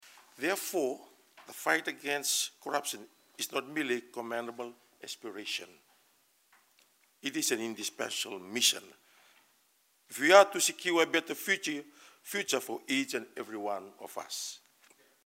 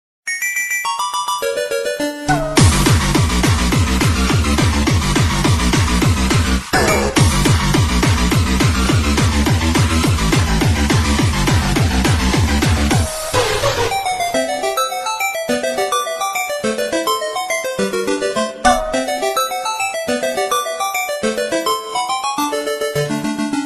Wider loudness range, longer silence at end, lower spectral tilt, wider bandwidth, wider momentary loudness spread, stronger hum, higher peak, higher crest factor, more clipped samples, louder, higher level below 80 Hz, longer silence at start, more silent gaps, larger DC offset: first, 10 LU vs 4 LU; first, 0.7 s vs 0 s; second, -1 dB/octave vs -4.5 dB/octave; about the same, 16 kHz vs 15.5 kHz; first, 16 LU vs 5 LU; neither; second, -6 dBFS vs 0 dBFS; first, 28 dB vs 16 dB; neither; second, -31 LUFS vs -16 LUFS; second, under -90 dBFS vs -24 dBFS; first, 0.4 s vs 0.25 s; neither; neither